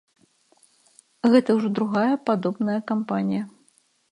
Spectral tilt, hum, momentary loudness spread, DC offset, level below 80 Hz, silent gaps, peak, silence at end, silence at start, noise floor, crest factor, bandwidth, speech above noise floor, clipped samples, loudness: -7.5 dB/octave; none; 8 LU; under 0.1%; -74 dBFS; none; -6 dBFS; 0.65 s; 1.25 s; -63 dBFS; 20 dB; 11 kHz; 41 dB; under 0.1%; -23 LUFS